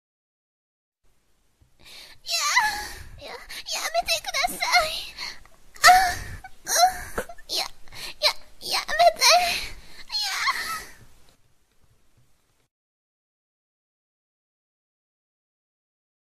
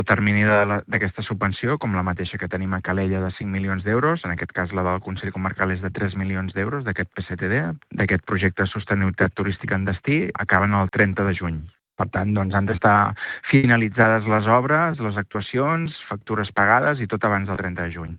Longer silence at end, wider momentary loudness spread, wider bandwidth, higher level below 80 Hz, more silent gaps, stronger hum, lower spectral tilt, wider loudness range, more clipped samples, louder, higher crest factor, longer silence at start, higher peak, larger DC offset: first, 5.3 s vs 0 s; first, 21 LU vs 10 LU; first, 15 kHz vs 4.8 kHz; about the same, -50 dBFS vs -50 dBFS; neither; neither; second, 0.5 dB/octave vs -11 dB/octave; first, 9 LU vs 5 LU; neither; about the same, -22 LUFS vs -22 LUFS; about the same, 24 dB vs 22 dB; first, 1.85 s vs 0 s; second, -4 dBFS vs 0 dBFS; neither